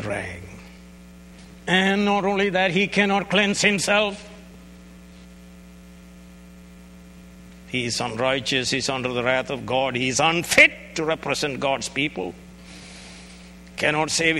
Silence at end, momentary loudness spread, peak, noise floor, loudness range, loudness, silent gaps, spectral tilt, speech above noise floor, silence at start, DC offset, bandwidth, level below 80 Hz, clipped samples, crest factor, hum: 0 s; 23 LU; 0 dBFS; -45 dBFS; 8 LU; -21 LUFS; none; -3.5 dB/octave; 23 dB; 0 s; under 0.1%; 16 kHz; -50 dBFS; under 0.1%; 24 dB; none